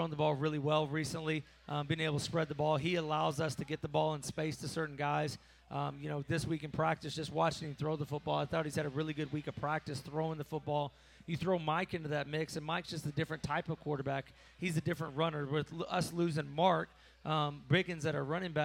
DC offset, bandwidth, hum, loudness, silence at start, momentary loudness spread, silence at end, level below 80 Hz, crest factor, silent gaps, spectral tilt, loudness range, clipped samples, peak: under 0.1%; 16 kHz; none; -36 LUFS; 0 s; 7 LU; 0 s; -64 dBFS; 18 dB; none; -5.5 dB/octave; 3 LU; under 0.1%; -18 dBFS